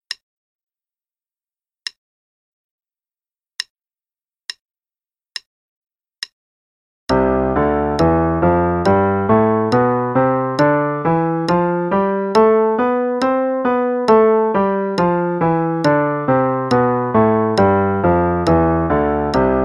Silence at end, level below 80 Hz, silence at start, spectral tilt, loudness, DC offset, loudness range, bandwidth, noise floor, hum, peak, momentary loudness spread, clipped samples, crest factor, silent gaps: 0 s; -38 dBFS; 0.1 s; -7.5 dB/octave; -16 LUFS; under 0.1%; 20 LU; 11.5 kHz; under -90 dBFS; none; -2 dBFS; 17 LU; under 0.1%; 16 dB; 0.23-0.67 s, 1.98-2.78 s, 3.70-3.75 s, 4.61-4.65 s, 5.46-5.82 s, 6.32-7.07 s